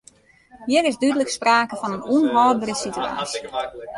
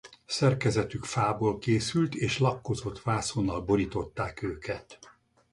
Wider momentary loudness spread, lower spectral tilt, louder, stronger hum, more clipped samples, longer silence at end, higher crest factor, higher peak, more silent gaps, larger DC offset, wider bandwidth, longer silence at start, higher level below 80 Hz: about the same, 10 LU vs 8 LU; second, -3.5 dB/octave vs -5.5 dB/octave; first, -21 LUFS vs -29 LUFS; neither; neither; second, 0 s vs 0.45 s; about the same, 16 dB vs 18 dB; first, -4 dBFS vs -12 dBFS; neither; neither; about the same, 11.5 kHz vs 11.5 kHz; first, 0.55 s vs 0.05 s; second, -58 dBFS vs -50 dBFS